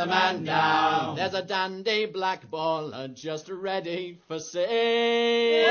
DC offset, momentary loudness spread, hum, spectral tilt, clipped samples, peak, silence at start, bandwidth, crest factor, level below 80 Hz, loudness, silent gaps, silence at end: under 0.1%; 13 LU; none; -4 dB/octave; under 0.1%; -8 dBFS; 0 s; 6.8 kHz; 18 dB; -72 dBFS; -26 LUFS; none; 0 s